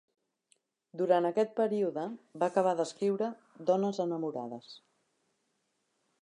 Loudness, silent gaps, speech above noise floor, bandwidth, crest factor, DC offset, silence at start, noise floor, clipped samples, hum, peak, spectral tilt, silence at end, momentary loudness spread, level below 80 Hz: -32 LUFS; none; 48 dB; 11 kHz; 20 dB; under 0.1%; 0.95 s; -79 dBFS; under 0.1%; none; -14 dBFS; -6.5 dB/octave; 1.45 s; 13 LU; -88 dBFS